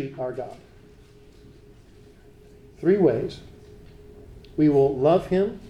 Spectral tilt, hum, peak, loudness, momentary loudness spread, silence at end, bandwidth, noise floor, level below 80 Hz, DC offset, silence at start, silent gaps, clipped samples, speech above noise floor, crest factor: -9 dB/octave; none; -8 dBFS; -22 LUFS; 16 LU; 0 s; 9.8 kHz; -50 dBFS; -50 dBFS; under 0.1%; 0 s; none; under 0.1%; 28 dB; 18 dB